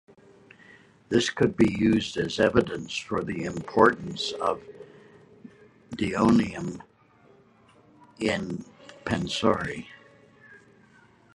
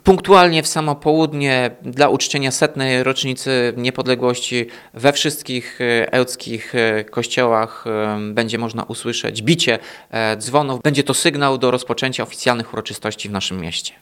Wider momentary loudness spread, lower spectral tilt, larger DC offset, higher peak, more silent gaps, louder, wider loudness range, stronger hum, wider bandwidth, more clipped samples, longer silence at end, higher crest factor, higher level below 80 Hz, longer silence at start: first, 17 LU vs 8 LU; first, -5.5 dB/octave vs -4 dB/octave; neither; second, -4 dBFS vs 0 dBFS; neither; second, -26 LUFS vs -18 LUFS; first, 6 LU vs 2 LU; neither; second, 11.5 kHz vs 16.5 kHz; neither; first, 0.8 s vs 0.1 s; first, 24 dB vs 18 dB; about the same, -54 dBFS vs -50 dBFS; first, 1.1 s vs 0.05 s